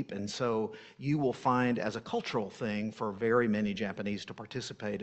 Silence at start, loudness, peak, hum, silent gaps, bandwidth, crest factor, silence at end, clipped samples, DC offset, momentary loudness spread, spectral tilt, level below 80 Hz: 0 s; -33 LUFS; -14 dBFS; none; none; 8.4 kHz; 18 dB; 0 s; under 0.1%; under 0.1%; 11 LU; -6 dB/octave; -66 dBFS